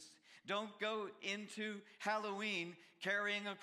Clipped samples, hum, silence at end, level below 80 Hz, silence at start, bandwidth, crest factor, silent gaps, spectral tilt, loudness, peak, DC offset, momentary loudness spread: under 0.1%; none; 0 s; under -90 dBFS; 0 s; 14 kHz; 18 dB; none; -3.5 dB/octave; -42 LUFS; -26 dBFS; under 0.1%; 8 LU